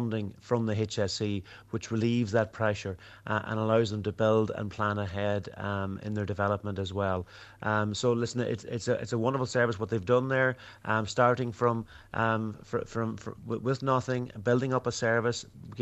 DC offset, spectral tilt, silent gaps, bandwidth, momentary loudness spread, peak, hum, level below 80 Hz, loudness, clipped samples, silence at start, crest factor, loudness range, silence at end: under 0.1%; -6 dB/octave; none; 8.4 kHz; 9 LU; -10 dBFS; none; -60 dBFS; -30 LUFS; under 0.1%; 0 s; 20 dB; 3 LU; 0 s